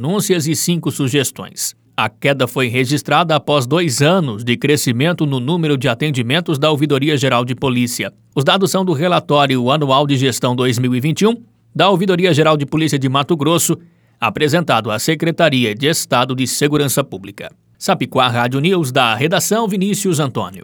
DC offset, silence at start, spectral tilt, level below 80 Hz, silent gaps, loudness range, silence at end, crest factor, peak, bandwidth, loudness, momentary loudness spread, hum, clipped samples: under 0.1%; 0 s; -4.5 dB/octave; -58 dBFS; none; 2 LU; 0 s; 16 dB; 0 dBFS; over 20 kHz; -15 LUFS; 7 LU; none; under 0.1%